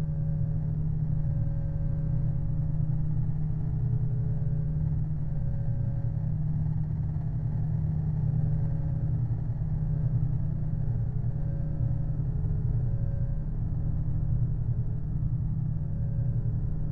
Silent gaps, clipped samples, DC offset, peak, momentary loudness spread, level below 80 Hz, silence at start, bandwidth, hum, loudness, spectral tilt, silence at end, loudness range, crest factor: none; under 0.1%; under 0.1%; -16 dBFS; 3 LU; -34 dBFS; 0 s; 2.1 kHz; none; -30 LUFS; -12.5 dB/octave; 0 s; 1 LU; 12 dB